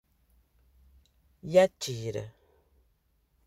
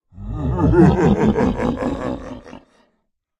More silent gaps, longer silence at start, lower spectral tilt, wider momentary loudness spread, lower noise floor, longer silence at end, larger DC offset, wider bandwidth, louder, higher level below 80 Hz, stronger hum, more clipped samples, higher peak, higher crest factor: neither; first, 1.45 s vs 0.15 s; second, -5 dB/octave vs -9 dB/octave; first, 22 LU vs 18 LU; about the same, -71 dBFS vs -70 dBFS; first, 1.15 s vs 0.8 s; neither; first, 15 kHz vs 9.8 kHz; second, -28 LUFS vs -17 LUFS; second, -64 dBFS vs -32 dBFS; neither; neither; second, -8 dBFS vs 0 dBFS; first, 24 dB vs 18 dB